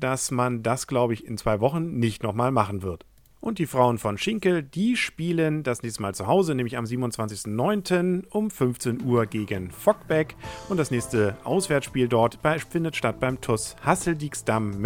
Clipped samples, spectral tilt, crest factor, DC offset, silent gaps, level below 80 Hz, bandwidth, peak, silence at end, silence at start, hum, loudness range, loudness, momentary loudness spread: under 0.1%; -5.5 dB/octave; 20 dB; under 0.1%; none; -52 dBFS; 18.5 kHz; -4 dBFS; 0 s; 0 s; none; 1 LU; -25 LUFS; 7 LU